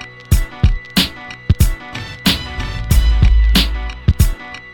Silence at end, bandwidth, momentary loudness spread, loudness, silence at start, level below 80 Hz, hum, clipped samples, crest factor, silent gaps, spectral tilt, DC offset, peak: 0 s; 17.5 kHz; 11 LU; -16 LUFS; 0 s; -16 dBFS; none; under 0.1%; 14 dB; none; -4.5 dB/octave; under 0.1%; 0 dBFS